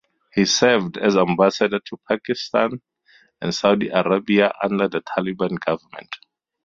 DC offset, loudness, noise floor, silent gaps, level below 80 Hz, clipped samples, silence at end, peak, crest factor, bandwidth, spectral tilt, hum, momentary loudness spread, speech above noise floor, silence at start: under 0.1%; -20 LUFS; -56 dBFS; none; -60 dBFS; under 0.1%; 0.5 s; 0 dBFS; 20 dB; 7.6 kHz; -4.5 dB/octave; none; 12 LU; 37 dB; 0.35 s